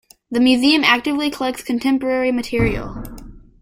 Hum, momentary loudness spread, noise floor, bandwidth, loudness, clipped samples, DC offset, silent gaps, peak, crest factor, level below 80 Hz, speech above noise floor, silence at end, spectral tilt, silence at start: none; 14 LU; -38 dBFS; 16 kHz; -17 LUFS; under 0.1%; under 0.1%; none; -2 dBFS; 16 dB; -38 dBFS; 20 dB; 0.25 s; -5 dB/octave; 0.3 s